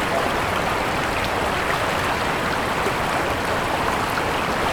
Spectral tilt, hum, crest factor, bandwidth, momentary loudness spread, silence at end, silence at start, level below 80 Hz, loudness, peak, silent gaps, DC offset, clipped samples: -4 dB/octave; none; 14 dB; over 20 kHz; 1 LU; 0 s; 0 s; -38 dBFS; -22 LUFS; -8 dBFS; none; under 0.1%; under 0.1%